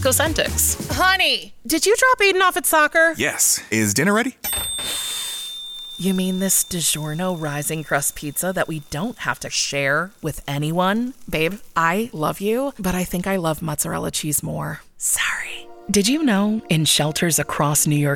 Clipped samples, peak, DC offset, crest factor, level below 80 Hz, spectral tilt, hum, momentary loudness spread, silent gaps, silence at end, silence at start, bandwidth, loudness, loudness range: under 0.1%; -6 dBFS; under 0.1%; 16 dB; -44 dBFS; -3 dB/octave; none; 10 LU; none; 0 s; 0 s; 19 kHz; -20 LUFS; 6 LU